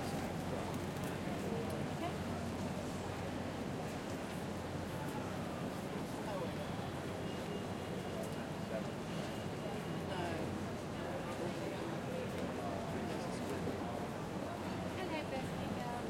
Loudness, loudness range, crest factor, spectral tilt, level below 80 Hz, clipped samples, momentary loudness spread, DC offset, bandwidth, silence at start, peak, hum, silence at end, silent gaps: -42 LUFS; 1 LU; 14 dB; -6 dB/octave; -62 dBFS; under 0.1%; 2 LU; under 0.1%; 16.5 kHz; 0 s; -26 dBFS; none; 0 s; none